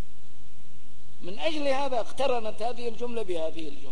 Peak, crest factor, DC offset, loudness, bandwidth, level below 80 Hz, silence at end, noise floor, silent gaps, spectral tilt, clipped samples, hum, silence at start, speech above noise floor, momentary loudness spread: -12 dBFS; 18 dB; 10%; -31 LUFS; 11 kHz; -58 dBFS; 0 s; -55 dBFS; none; -5 dB/octave; under 0.1%; none; 0 s; 24 dB; 10 LU